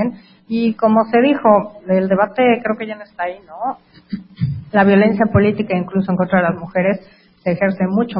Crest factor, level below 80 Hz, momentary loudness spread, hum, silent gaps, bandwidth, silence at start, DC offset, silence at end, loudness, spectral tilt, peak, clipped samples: 16 dB; -46 dBFS; 12 LU; none; none; 5.4 kHz; 0 s; under 0.1%; 0 s; -16 LUFS; -12.5 dB/octave; 0 dBFS; under 0.1%